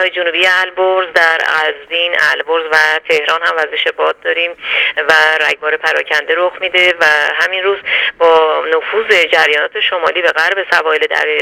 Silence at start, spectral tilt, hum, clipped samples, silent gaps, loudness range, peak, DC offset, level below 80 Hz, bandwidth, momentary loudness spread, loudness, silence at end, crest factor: 0 s; -1 dB/octave; none; under 0.1%; none; 1 LU; 0 dBFS; under 0.1%; -58 dBFS; 17.5 kHz; 5 LU; -11 LUFS; 0 s; 12 dB